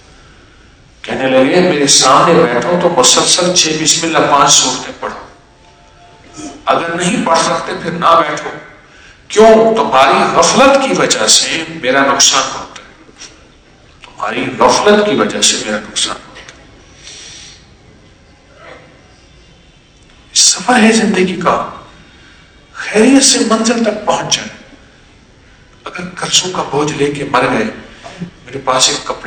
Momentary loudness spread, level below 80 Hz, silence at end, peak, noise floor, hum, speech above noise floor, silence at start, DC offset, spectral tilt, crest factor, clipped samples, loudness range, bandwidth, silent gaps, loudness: 19 LU; -46 dBFS; 0 s; 0 dBFS; -44 dBFS; none; 33 dB; 1.05 s; under 0.1%; -2.5 dB/octave; 14 dB; 0.8%; 8 LU; 11 kHz; none; -10 LUFS